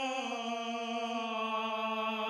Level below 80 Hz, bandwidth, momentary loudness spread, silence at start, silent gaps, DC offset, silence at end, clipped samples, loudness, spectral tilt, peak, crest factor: under -90 dBFS; 13.5 kHz; 3 LU; 0 s; none; under 0.1%; 0 s; under 0.1%; -35 LUFS; -3 dB/octave; -24 dBFS; 12 dB